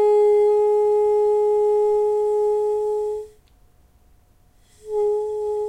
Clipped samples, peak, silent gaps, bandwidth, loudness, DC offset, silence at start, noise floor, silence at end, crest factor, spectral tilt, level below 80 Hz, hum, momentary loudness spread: under 0.1%; -10 dBFS; none; 8.8 kHz; -20 LUFS; under 0.1%; 0 s; -55 dBFS; 0 s; 10 dB; -5.5 dB/octave; -56 dBFS; none; 9 LU